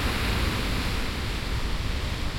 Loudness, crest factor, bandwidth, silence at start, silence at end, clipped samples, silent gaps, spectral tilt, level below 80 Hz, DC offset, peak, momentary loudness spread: -29 LUFS; 12 dB; 16.5 kHz; 0 s; 0 s; under 0.1%; none; -4.5 dB/octave; -30 dBFS; under 0.1%; -14 dBFS; 4 LU